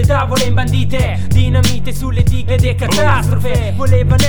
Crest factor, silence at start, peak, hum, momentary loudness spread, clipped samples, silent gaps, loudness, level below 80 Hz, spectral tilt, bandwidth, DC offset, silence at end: 12 dB; 0 s; 0 dBFS; none; 4 LU; under 0.1%; none; -14 LUFS; -22 dBFS; -5.5 dB/octave; over 20 kHz; under 0.1%; 0 s